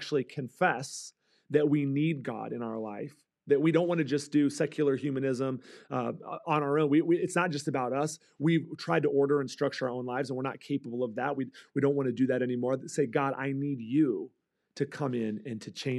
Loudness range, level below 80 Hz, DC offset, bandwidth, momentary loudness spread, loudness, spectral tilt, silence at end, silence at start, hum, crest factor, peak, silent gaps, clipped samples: 3 LU; -88 dBFS; under 0.1%; 12.5 kHz; 10 LU; -30 LUFS; -6.5 dB/octave; 0 s; 0 s; none; 18 dB; -12 dBFS; none; under 0.1%